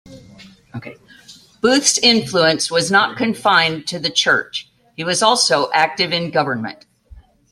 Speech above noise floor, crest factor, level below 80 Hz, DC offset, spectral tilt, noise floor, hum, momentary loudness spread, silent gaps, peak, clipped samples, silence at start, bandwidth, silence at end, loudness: 28 dB; 18 dB; -54 dBFS; under 0.1%; -2.5 dB/octave; -45 dBFS; none; 16 LU; none; 0 dBFS; under 0.1%; 0.05 s; 13.5 kHz; 0.35 s; -15 LUFS